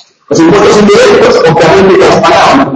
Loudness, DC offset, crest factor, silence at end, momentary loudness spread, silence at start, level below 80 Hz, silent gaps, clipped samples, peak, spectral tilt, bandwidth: -4 LUFS; under 0.1%; 4 dB; 0 s; 2 LU; 0.3 s; -34 dBFS; none; 7%; 0 dBFS; -5 dB/octave; 11 kHz